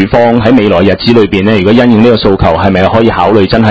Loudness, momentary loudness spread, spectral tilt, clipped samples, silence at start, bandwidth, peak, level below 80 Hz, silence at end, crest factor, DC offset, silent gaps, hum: -7 LUFS; 2 LU; -8 dB/octave; 5%; 0 s; 8 kHz; 0 dBFS; -26 dBFS; 0 s; 6 dB; 2%; none; none